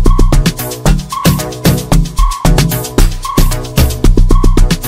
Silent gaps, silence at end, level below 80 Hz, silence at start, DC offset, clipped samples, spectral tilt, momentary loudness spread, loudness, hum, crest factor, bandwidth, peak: none; 0 s; -10 dBFS; 0 s; under 0.1%; under 0.1%; -5.5 dB/octave; 3 LU; -12 LUFS; none; 8 dB; 16 kHz; 0 dBFS